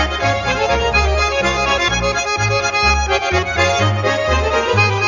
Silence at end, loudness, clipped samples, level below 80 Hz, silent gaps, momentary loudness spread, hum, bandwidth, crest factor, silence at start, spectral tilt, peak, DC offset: 0 s; -15 LUFS; under 0.1%; -26 dBFS; none; 3 LU; none; 7.4 kHz; 14 dB; 0 s; -4 dB/octave; -2 dBFS; 0.2%